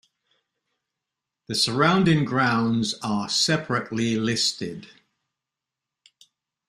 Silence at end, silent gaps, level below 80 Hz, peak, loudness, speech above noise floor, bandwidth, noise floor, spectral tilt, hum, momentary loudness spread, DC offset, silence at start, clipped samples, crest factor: 1.8 s; none; -60 dBFS; -6 dBFS; -22 LUFS; 64 dB; 14 kHz; -87 dBFS; -4 dB/octave; none; 9 LU; under 0.1%; 1.5 s; under 0.1%; 20 dB